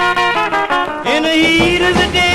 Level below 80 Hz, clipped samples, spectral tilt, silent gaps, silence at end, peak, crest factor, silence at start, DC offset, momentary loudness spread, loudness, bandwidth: -32 dBFS; under 0.1%; -4 dB/octave; none; 0 s; -2 dBFS; 12 dB; 0 s; 0.8%; 5 LU; -12 LUFS; 13 kHz